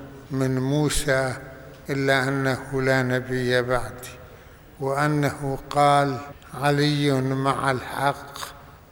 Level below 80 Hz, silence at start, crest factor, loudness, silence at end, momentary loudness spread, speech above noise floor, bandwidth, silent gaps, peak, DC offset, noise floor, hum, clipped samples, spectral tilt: -44 dBFS; 0 s; 18 dB; -23 LUFS; 0.15 s; 15 LU; 23 dB; over 20 kHz; none; -6 dBFS; under 0.1%; -46 dBFS; none; under 0.1%; -5.5 dB/octave